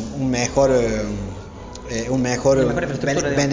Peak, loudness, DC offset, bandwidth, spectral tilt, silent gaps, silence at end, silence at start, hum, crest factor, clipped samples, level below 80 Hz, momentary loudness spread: -4 dBFS; -20 LUFS; under 0.1%; 7.6 kHz; -5 dB/octave; none; 0 s; 0 s; none; 16 dB; under 0.1%; -38 dBFS; 15 LU